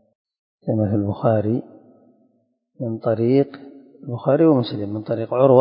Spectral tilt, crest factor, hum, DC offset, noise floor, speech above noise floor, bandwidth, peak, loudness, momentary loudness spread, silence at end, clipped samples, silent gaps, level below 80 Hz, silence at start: -13 dB/octave; 20 dB; none; under 0.1%; -66 dBFS; 47 dB; 5.4 kHz; 0 dBFS; -20 LUFS; 15 LU; 0 s; under 0.1%; none; -54 dBFS; 0.65 s